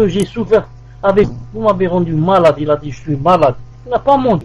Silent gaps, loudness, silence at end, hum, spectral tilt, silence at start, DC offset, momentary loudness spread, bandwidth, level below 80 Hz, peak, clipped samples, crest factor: none; -14 LUFS; 0 s; none; -7.5 dB/octave; 0 s; under 0.1%; 7 LU; 12.5 kHz; -38 dBFS; -2 dBFS; under 0.1%; 12 dB